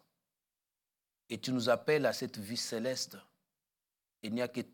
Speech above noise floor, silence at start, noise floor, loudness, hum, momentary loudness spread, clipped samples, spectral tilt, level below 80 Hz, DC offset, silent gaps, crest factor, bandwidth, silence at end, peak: over 56 dB; 1.3 s; under -90 dBFS; -34 LUFS; none; 13 LU; under 0.1%; -4 dB/octave; -88 dBFS; under 0.1%; none; 20 dB; 18 kHz; 0.05 s; -18 dBFS